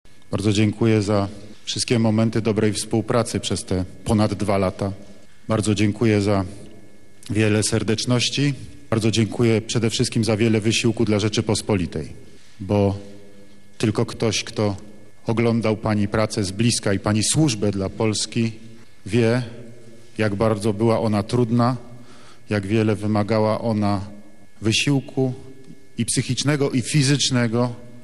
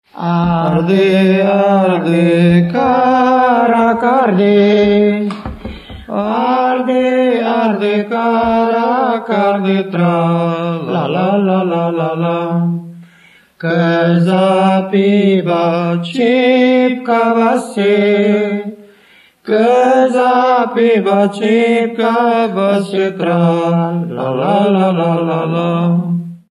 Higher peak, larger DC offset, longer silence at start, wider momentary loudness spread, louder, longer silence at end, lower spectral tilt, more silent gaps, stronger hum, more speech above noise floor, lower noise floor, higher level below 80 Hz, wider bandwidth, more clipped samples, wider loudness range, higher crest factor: second, -6 dBFS vs 0 dBFS; first, 1% vs under 0.1%; first, 0.3 s vs 0.15 s; about the same, 9 LU vs 7 LU; second, -21 LUFS vs -13 LUFS; about the same, 0.05 s vs 0.15 s; second, -5 dB/octave vs -7.5 dB/octave; neither; neither; second, 29 dB vs 35 dB; about the same, -49 dBFS vs -47 dBFS; second, -52 dBFS vs -46 dBFS; first, 12.5 kHz vs 11 kHz; neither; about the same, 3 LU vs 4 LU; about the same, 16 dB vs 12 dB